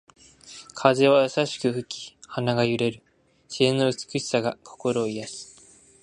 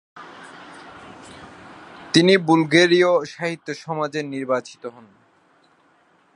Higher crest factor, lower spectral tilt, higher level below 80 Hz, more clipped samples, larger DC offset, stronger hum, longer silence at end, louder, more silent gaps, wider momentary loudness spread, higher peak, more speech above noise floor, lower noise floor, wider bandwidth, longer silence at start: about the same, 22 dB vs 22 dB; about the same, -5 dB/octave vs -5 dB/octave; about the same, -66 dBFS vs -66 dBFS; neither; neither; neither; second, 0.6 s vs 1.45 s; second, -24 LUFS vs -19 LUFS; neither; second, 19 LU vs 26 LU; about the same, -2 dBFS vs -2 dBFS; second, 30 dB vs 40 dB; second, -53 dBFS vs -59 dBFS; about the same, 11 kHz vs 11 kHz; first, 0.45 s vs 0.15 s